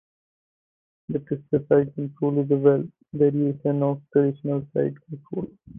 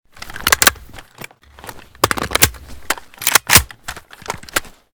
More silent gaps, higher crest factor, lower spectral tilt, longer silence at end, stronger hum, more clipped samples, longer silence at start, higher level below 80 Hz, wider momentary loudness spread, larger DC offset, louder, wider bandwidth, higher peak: neither; about the same, 18 dB vs 20 dB; first, -13 dB/octave vs -1 dB/octave; second, 0 s vs 0.25 s; neither; second, under 0.1% vs 0.4%; first, 1.1 s vs 0.2 s; second, -62 dBFS vs -36 dBFS; second, 13 LU vs 25 LU; neither; second, -24 LUFS vs -15 LUFS; second, 3.5 kHz vs over 20 kHz; second, -6 dBFS vs 0 dBFS